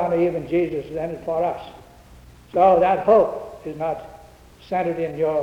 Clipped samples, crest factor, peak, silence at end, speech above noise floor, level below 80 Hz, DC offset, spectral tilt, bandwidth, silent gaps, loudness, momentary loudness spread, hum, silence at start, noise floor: under 0.1%; 16 dB; -4 dBFS; 0 s; 26 dB; -50 dBFS; under 0.1%; -8 dB/octave; 13.5 kHz; none; -21 LUFS; 16 LU; none; 0 s; -46 dBFS